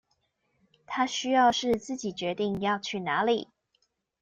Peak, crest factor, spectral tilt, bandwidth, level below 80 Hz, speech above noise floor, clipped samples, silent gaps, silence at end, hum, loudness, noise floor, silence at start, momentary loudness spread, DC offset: -12 dBFS; 16 dB; -4 dB/octave; 9.6 kHz; -64 dBFS; 48 dB; under 0.1%; none; 0.75 s; none; -28 LUFS; -75 dBFS; 0.9 s; 10 LU; under 0.1%